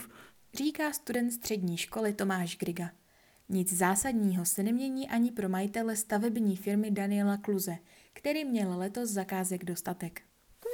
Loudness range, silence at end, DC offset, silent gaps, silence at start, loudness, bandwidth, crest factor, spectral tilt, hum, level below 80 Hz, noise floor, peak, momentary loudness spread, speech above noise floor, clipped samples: 4 LU; 0 s; under 0.1%; none; 0 s; -32 LUFS; 19.5 kHz; 18 dB; -4.5 dB/octave; none; -66 dBFS; -55 dBFS; -14 dBFS; 9 LU; 24 dB; under 0.1%